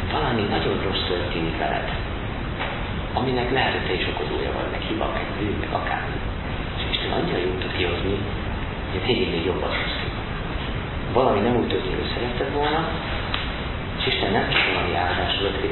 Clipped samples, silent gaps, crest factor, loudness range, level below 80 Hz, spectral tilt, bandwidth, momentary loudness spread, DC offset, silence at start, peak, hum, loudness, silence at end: under 0.1%; none; 18 dB; 3 LU; -34 dBFS; -10.5 dB/octave; 4.3 kHz; 8 LU; under 0.1%; 0 s; -6 dBFS; none; -24 LUFS; 0 s